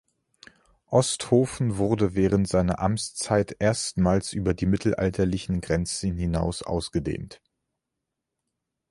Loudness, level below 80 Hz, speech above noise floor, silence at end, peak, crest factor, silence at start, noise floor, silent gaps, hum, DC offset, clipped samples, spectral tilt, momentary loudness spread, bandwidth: -25 LUFS; -42 dBFS; 59 dB; 1.55 s; -6 dBFS; 20 dB; 0.9 s; -84 dBFS; none; none; under 0.1%; under 0.1%; -5.5 dB/octave; 6 LU; 11.5 kHz